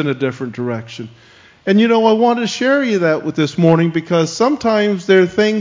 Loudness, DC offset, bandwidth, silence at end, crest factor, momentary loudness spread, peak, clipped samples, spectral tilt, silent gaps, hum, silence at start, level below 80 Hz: -15 LUFS; under 0.1%; 7.6 kHz; 0 s; 14 dB; 11 LU; 0 dBFS; under 0.1%; -6 dB/octave; none; none; 0 s; -56 dBFS